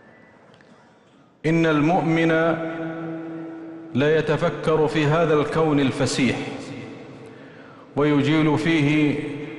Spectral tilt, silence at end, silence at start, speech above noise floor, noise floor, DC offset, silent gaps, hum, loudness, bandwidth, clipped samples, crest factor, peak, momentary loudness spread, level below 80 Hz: -6.5 dB/octave; 0 s; 1.45 s; 34 dB; -54 dBFS; under 0.1%; none; none; -21 LUFS; 11.5 kHz; under 0.1%; 14 dB; -8 dBFS; 17 LU; -52 dBFS